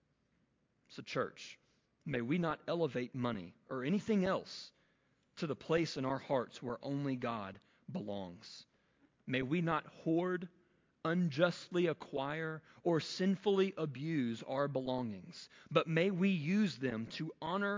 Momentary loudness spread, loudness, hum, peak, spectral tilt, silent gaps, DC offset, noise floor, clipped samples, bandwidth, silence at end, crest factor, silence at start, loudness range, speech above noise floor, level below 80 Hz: 16 LU; -37 LUFS; none; -16 dBFS; -6.5 dB/octave; none; under 0.1%; -77 dBFS; under 0.1%; 7.6 kHz; 0 s; 22 dB; 0.9 s; 5 LU; 41 dB; -72 dBFS